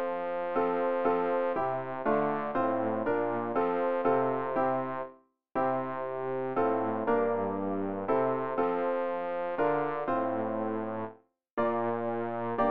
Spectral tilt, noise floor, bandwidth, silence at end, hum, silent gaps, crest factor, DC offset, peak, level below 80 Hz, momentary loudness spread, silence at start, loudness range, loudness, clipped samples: -6 dB/octave; -53 dBFS; 4.8 kHz; 0 s; none; 11.53-11.57 s; 16 dB; 0.4%; -14 dBFS; -66 dBFS; 5 LU; 0 s; 2 LU; -31 LUFS; under 0.1%